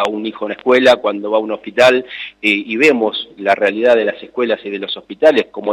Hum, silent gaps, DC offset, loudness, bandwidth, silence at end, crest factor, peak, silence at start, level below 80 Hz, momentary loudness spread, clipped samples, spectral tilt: none; none; under 0.1%; -15 LUFS; 13.5 kHz; 0 s; 14 dB; -2 dBFS; 0 s; -58 dBFS; 10 LU; under 0.1%; -4 dB/octave